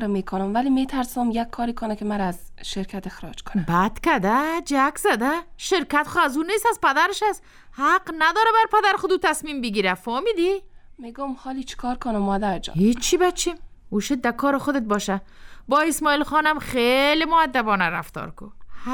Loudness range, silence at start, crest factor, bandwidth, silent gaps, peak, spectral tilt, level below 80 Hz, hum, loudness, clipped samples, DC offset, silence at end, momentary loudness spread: 5 LU; 0 s; 16 dB; 19.5 kHz; none; -6 dBFS; -4 dB/octave; -42 dBFS; none; -22 LUFS; under 0.1%; under 0.1%; 0 s; 13 LU